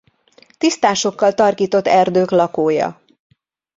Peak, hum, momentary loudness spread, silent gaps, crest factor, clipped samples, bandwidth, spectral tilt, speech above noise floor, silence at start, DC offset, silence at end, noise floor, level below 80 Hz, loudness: -2 dBFS; none; 6 LU; none; 16 dB; under 0.1%; 7.8 kHz; -4.5 dB/octave; 37 dB; 0.6 s; under 0.1%; 0.85 s; -52 dBFS; -60 dBFS; -16 LUFS